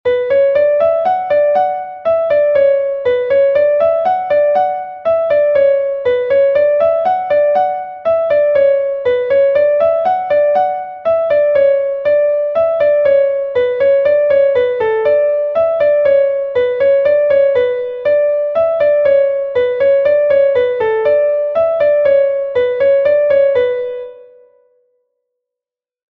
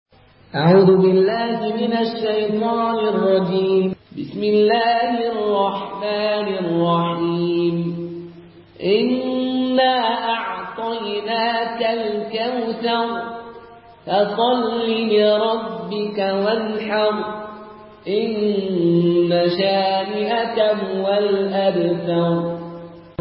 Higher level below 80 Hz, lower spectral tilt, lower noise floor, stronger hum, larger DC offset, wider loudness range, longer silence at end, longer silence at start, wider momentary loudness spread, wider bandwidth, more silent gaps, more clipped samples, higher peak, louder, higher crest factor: first, -54 dBFS vs -60 dBFS; second, -6.5 dB/octave vs -11.5 dB/octave; first, -87 dBFS vs -43 dBFS; neither; neither; second, 1 LU vs 4 LU; first, 1.9 s vs 0.1 s; second, 0.05 s vs 0.55 s; second, 5 LU vs 11 LU; second, 4.5 kHz vs 5.6 kHz; neither; neither; about the same, -2 dBFS vs -2 dBFS; first, -13 LUFS vs -19 LUFS; second, 10 dB vs 16 dB